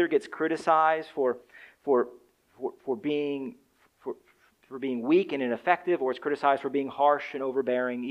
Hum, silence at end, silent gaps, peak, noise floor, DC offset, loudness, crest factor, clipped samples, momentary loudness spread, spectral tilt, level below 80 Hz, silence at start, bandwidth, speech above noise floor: none; 0 s; none; -8 dBFS; -63 dBFS; under 0.1%; -28 LUFS; 22 dB; under 0.1%; 14 LU; -6 dB/octave; -78 dBFS; 0 s; 10.5 kHz; 36 dB